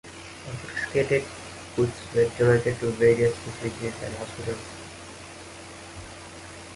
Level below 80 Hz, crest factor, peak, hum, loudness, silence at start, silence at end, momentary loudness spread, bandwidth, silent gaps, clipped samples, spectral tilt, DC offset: -50 dBFS; 20 dB; -8 dBFS; none; -26 LUFS; 0.05 s; 0 s; 20 LU; 11.5 kHz; none; under 0.1%; -5.5 dB/octave; under 0.1%